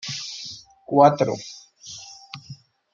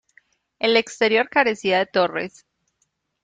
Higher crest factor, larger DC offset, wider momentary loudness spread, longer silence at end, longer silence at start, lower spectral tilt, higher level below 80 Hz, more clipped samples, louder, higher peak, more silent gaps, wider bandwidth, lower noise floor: about the same, 22 dB vs 18 dB; neither; first, 23 LU vs 7 LU; second, 0.4 s vs 0.95 s; second, 0.05 s vs 0.6 s; first, -5 dB/octave vs -3.5 dB/octave; about the same, -68 dBFS vs -66 dBFS; neither; about the same, -21 LUFS vs -20 LUFS; about the same, -2 dBFS vs -4 dBFS; neither; second, 7.6 kHz vs 9.2 kHz; second, -45 dBFS vs -72 dBFS